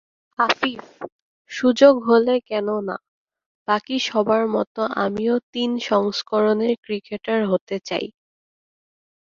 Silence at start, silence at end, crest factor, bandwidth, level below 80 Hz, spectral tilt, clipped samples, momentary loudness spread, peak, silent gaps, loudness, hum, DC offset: 0.4 s; 1.2 s; 20 dB; 7.6 kHz; -66 dBFS; -5 dB/octave; under 0.1%; 17 LU; -2 dBFS; 1.12-1.45 s, 3.08-3.26 s, 3.46-3.66 s, 4.67-4.75 s, 5.43-5.53 s, 6.78-6.83 s, 7.61-7.67 s; -21 LUFS; none; under 0.1%